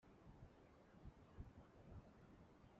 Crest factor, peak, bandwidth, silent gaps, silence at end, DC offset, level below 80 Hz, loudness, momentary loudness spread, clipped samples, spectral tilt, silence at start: 20 dB; -44 dBFS; 7.2 kHz; none; 0 s; under 0.1%; -68 dBFS; -65 LUFS; 5 LU; under 0.1%; -7 dB/octave; 0 s